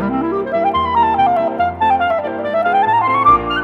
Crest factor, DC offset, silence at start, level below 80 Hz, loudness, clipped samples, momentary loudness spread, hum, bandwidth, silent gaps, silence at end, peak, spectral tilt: 14 dB; under 0.1%; 0 s; -40 dBFS; -15 LUFS; under 0.1%; 6 LU; none; 7.4 kHz; none; 0 s; 0 dBFS; -7 dB/octave